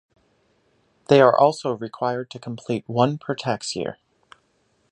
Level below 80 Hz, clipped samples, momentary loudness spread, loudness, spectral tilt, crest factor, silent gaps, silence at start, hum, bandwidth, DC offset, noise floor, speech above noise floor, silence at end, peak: -64 dBFS; under 0.1%; 15 LU; -21 LUFS; -5.5 dB/octave; 22 dB; none; 1.1 s; none; 11 kHz; under 0.1%; -66 dBFS; 45 dB; 1 s; -2 dBFS